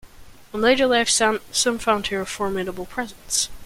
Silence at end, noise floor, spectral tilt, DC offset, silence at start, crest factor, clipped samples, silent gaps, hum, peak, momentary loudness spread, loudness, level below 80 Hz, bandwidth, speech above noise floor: 0 s; -44 dBFS; -2 dB/octave; under 0.1%; 0.05 s; 18 dB; under 0.1%; none; none; -6 dBFS; 12 LU; -21 LUFS; -46 dBFS; 16.5 kHz; 22 dB